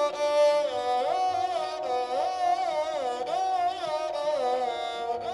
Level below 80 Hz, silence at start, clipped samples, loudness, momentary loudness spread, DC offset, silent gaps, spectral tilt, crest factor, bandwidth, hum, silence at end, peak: -66 dBFS; 0 s; under 0.1%; -27 LUFS; 7 LU; under 0.1%; none; -2.5 dB/octave; 14 dB; 12 kHz; none; 0 s; -14 dBFS